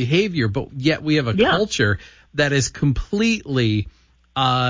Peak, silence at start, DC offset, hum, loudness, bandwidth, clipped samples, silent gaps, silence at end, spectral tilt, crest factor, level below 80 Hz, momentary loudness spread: -6 dBFS; 0 s; under 0.1%; none; -20 LUFS; 7.6 kHz; under 0.1%; none; 0 s; -5 dB/octave; 14 dB; -38 dBFS; 8 LU